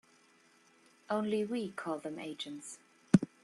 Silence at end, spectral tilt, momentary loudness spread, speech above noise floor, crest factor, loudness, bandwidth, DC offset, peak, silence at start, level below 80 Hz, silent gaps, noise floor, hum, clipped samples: 0.2 s; -6.5 dB/octave; 16 LU; 29 dB; 26 dB; -36 LUFS; 12 kHz; under 0.1%; -10 dBFS; 1.1 s; -70 dBFS; none; -66 dBFS; none; under 0.1%